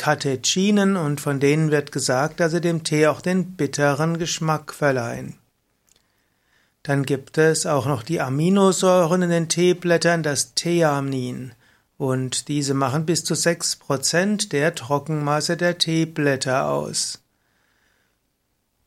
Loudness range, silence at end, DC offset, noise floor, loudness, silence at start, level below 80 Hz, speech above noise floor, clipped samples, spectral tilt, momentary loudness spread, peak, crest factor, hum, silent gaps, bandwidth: 6 LU; 1.7 s; under 0.1%; -71 dBFS; -21 LUFS; 0 s; -62 dBFS; 50 dB; under 0.1%; -4.5 dB/octave; 7 LU; -4 dBFS; 18 dB; none; none; 15.5 kHz